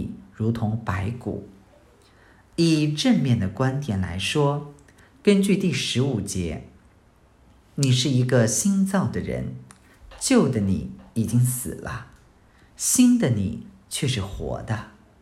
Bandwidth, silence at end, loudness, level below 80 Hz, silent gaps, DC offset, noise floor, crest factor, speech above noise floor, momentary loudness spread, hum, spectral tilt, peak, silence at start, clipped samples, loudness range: 16 kHz; 0.3 s; -23 LUFS; -50 dBFS; none; under 0.1%; -56 dBFS; 20 dB; 34 dB; 14 LU; none; -5 dB/octave; -4 dBFS; 0 s; under 0.1%; 3 LU